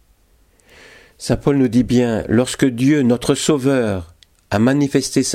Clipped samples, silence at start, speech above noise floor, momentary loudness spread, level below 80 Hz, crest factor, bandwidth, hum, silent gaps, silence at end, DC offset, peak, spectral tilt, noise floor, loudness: under 0.1%; 1.2 s; 39 dB; 7 LU; -42 dBFS; 16 dB; 15 kHz; none; none; 0 s; under 0.1%; -2 dBFS; -5.5 dB/octave; -55 dBFS; -17 LUFS